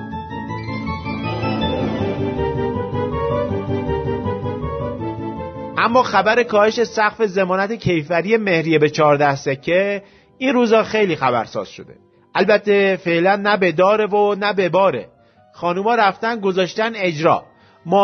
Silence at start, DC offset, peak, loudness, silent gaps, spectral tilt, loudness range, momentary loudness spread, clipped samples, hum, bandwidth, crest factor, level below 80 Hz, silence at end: 0 s; under 0.1%; -2 dBFS; -18 LUFS; none; -6 dB/octave; 6 LU; 11 LU; under 0.1%; none; 6.6 kHz; 16 dB; -42 dBFS; 0 s